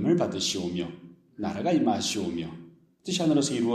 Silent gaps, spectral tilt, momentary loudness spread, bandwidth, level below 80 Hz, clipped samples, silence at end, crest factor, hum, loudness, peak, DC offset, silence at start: none; -4.5 dB/octave; 15 LU; 14 kHz; -64 dBFS; under 0.1%; 0 s; 16 dB; none; -27 LUFS; -10 dBFS; under 0.1%; 0 s